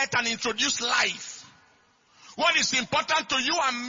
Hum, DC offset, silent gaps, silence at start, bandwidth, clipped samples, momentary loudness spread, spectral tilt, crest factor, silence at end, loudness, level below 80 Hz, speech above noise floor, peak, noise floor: none; under 0.1%; none; 0 s; 7.6 kHz; under 0.1%; 15 LU; -1 dB/octave; 18 dB; 0 s; -24 LUFS; -64 dBFS; 36 dB; -8 dBFS; -62 dBFS